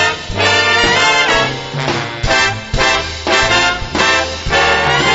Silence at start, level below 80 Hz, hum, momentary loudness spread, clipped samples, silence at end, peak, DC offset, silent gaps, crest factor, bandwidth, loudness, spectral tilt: 0 s; -30 dBFS; none; 8 LU; under 0.1%; 0 s; 0 dBFS; under 0.1%; none; 14 dB; 8.2 kHz; -12 LUFS; -2.5 dB/octave